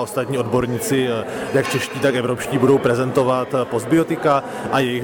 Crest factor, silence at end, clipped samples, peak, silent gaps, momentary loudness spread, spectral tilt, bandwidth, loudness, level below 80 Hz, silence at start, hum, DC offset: 14 dB; 0 s; under 0.1%; -4 dBFS; none; 5 LU; -5.5 dB/octave; 19.5 kHz; -19 LUFS; -52 dBFS; 0 s; none; under 0.1%